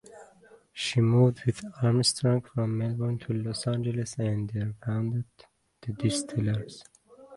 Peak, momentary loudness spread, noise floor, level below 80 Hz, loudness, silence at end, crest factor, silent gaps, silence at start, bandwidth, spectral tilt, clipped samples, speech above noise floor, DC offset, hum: -10 dBFS; 11 LU; -57 dBFS; -58 dBFS; -28 LUFS; 0 s; 18 dB; none; 0.1 s; 11.5 kHz; -6 dB/octave; under 0.1%; 29 dB; under 0.1%; none